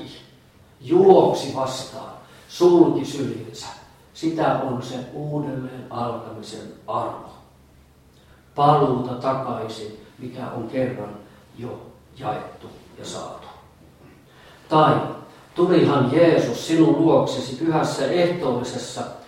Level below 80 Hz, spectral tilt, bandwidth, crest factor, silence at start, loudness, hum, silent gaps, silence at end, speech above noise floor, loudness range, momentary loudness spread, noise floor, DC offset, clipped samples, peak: -58 dBFS; -6.5 dB/octave; 13 kHz; 22 dB; 0 s; -21 LUFS; none; none; 0.05 s; 31 dB; 13 LU; 21 LU; -52 dBFS; under 0.1%; under 0.1%; 0 dBFS